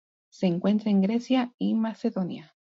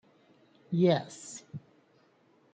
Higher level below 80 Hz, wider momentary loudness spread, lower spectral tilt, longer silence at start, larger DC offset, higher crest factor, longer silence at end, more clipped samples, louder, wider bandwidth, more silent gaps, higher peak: about the same, -74 dBFS vs -76 dBFS; second, 8 LU vs 21 LU; first, -8 dB/octave vs -6.5 dB/octave; second, 0.4 s vs 0.7 s; neither; second, 14 dB vs 20 dB; second, 0.35 s vs 0.95 s; neither; first, -26 LUFS vs -30 LUFS; second, 7.4 kHz vs 9.4 kHz; first, 1.54-1.58 s vs none; about the same, -14 dBFS vs -14 dBFS